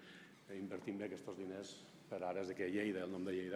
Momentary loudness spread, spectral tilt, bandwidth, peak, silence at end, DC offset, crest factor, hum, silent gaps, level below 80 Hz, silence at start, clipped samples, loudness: 13 LU; -5.5 dB/octave; 16 kHz; -28 dBFS; 0 s; under 0.1%; 16 dB; none; none; -88 dBFS; 0 s; under 0.1%; -45 LUFS